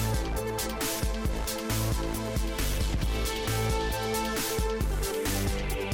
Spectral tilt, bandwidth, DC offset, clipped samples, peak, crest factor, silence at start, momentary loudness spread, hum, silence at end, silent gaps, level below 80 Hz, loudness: -4 dB/octave; 17 kHz; under 0.1%; under 0.1%; -16 dBFS; 12 dB; 0 s; 3 LU; none; 0 s; none; -32 dBFS; -30 LUFS